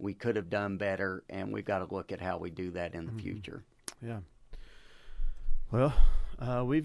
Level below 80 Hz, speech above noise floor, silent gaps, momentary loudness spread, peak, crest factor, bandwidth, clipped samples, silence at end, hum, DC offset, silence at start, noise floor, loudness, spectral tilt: -36 dBFS; 21 dB; none; 15 LU; -10 dBFS; 20 dB; 11.5 kHz; under 0.1%; 0 s; none; under 0.1%; 0 s; -50 dBFS; -35 LUFS; -7 dB/octave